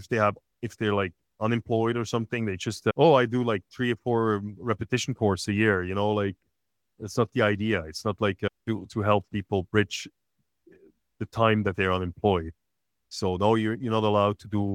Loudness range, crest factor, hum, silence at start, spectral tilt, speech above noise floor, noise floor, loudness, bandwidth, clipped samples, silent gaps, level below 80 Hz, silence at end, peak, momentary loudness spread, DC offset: 3 LU; 20 dB; none; 0 s; -6 dB/octave; 58 dB; -83 dBFS; -26 LUFS; 13.5 kHz; under 0.1%; none; -60 dBFS; 0 s; -6 dBFS; 9 LU; under 0.1%